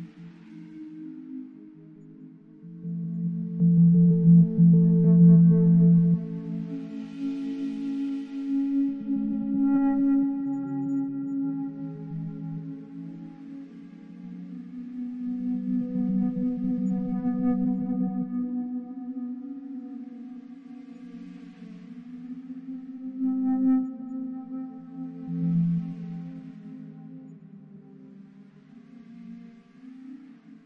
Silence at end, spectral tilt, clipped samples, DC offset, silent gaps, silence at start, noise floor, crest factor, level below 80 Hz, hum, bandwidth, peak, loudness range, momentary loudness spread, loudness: 0.1 s; -12 dB/octave; under 0.1%; under 0.1%; none; 0 s; -51 dBFS; 18 dB; -62 dBFS; none; 2.7 kHz; -8 dBFS; 20 LU; 25 LU; -25 LUFS